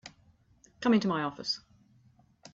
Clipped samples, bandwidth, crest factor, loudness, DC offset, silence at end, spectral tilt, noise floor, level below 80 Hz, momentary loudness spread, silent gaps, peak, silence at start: under 0.1%; 7.8 kHz; 20 dB; -30 LUFS; under 0.1%; 0.95 s; -5.5 dB/octave; -64 dBFS; -70 dBFS; 9 LU; none; -14 dBFS; 0.05 s